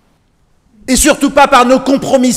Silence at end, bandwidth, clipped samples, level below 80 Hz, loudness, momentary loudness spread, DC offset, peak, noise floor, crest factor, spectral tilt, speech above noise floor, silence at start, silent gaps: 0 s; 16.5 kHz; 0.9%; -32 dBFS; -9 LUFS; 6 LU; under 0.1%; 0 dBFS; -54 dBFS; 10 dB; -3 dB/octave; 45 dB; 0.9 s; none